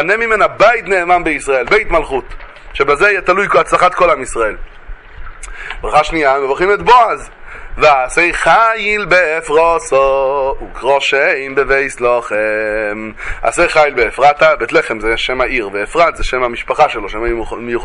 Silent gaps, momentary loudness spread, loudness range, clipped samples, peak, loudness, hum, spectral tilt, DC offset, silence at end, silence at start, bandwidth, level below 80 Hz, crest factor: none; 11 LU; 3 LU; under 0.1%; 0 dBFS; -12 LUFS; none; -3.5 dB/octave; under 0.1%; 0 s; 0 s; 11.5 kHz; -32 dBFS; 12 dB